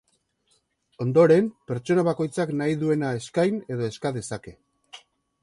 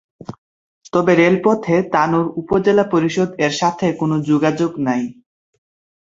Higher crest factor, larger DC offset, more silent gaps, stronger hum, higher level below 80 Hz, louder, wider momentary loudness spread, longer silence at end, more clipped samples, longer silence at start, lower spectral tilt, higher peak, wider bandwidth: about the same, 18 dB vs 16 dB; neither; second, none vs 0.38-0.81 s; neither; second, -62 dBFS vs -54 dBFS; second, -24 LUFS vs -17 LUFS; first, 14 LU vs 8 LU; second, 0.45 s vs 0.9 s; neither; first, 1 s vs 0.2 s; about the same, -7 dB/octave vs -6.5 dB/octave; second, -6 dBFS vs -2 dBFS; first, 11.5 kHz vs 7.8 kHz